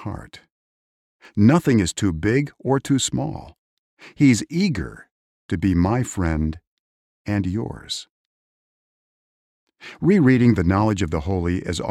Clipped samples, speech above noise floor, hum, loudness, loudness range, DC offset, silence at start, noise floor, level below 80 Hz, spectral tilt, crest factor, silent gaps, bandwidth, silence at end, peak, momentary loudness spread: under 0.1%; over 70 dB; none; -21 LUFS; 8 LU; under 0.1%; 0 s; under -90 dBFS; -40 dBFS; -6 dB/octave; 18 dB; 0.52-1.19 s, 3.58-3.97 s, 5.11-5.49 s, 6.67-7.25 s, 8.10-9.67 s; 13.5 kHz; 0 s; -4 dBFS; 14 LU